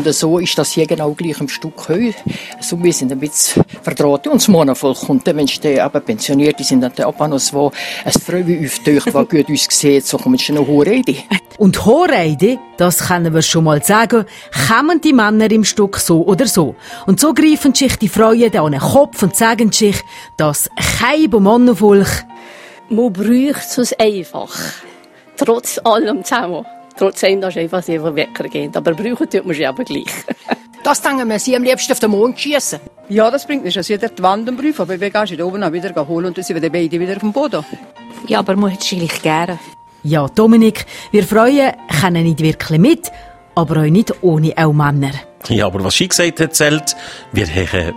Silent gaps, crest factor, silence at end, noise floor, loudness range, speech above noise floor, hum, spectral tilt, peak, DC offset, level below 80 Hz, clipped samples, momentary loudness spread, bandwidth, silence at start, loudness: none; 14 dB; 0 s; -41 dBFS; 6 LU; 28 dB; none; -4.5 dB/octave; 0 dBFS; under 0.1%; -44 dBFS; under 0.1%; 10 LU; 16.5 kHz; 0 s; -14 LUFS